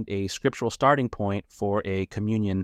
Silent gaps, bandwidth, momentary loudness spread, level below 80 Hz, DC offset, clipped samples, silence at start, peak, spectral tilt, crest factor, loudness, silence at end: none; 14.5 kHz; 8 LU; -54 dBFS; under 0.1%; under 0.1%; 0 s; -6 dBFS; -6 dB/octave; 20 dB; -26 LUFS; 0 s